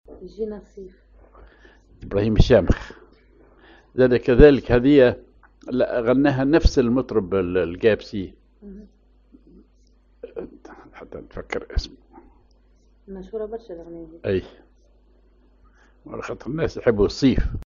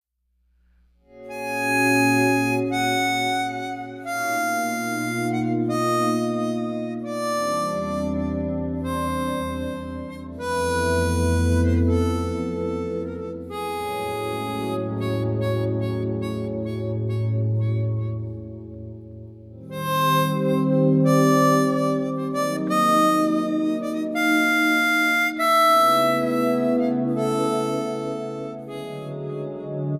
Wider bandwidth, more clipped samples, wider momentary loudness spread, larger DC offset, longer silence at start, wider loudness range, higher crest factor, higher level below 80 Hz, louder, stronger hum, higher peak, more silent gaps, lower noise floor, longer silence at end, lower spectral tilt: second, 7.4 kHz vs 15.5 kHz; neither; first, 24 LU vs 14 LU; neither; second, 0.1 s vs 1.15 s; first, 18 LU vs 7 LU; first, 22 dB vs 16 dB; first, -32 dBFS vs -44 dBFS; about the same, -20 LUFS vs -22 LUFS; neither; first, 0 dBFS vs -6 dBFS; neither; second, -56 dBFS vs -68 dBFS; about the same, 0.05 s vs 0 s; about the same, -6.5 dB/octave vs -5.5 dB/octave